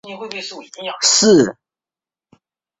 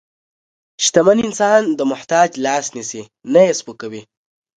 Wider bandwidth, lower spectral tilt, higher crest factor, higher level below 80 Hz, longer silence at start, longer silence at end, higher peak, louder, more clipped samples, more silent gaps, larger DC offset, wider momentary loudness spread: second, 8.4 kHz vs 9.6 kHz; about the same, -2.5 dB/octave vs -3.5 dB/octave; about the same, 18 dB vs 18 dB; about the same, -58 dBFS vs -60 dBFS; second, 0.05 s vs 0.8 s; first, 1.3 s vs 0.6 s; about the same, 0 dBFS vs 0 dBFS; about the same, -13 LUFS vs -15 LUFS; neither; neither; neither; about the same, 18 LU vs 17 LU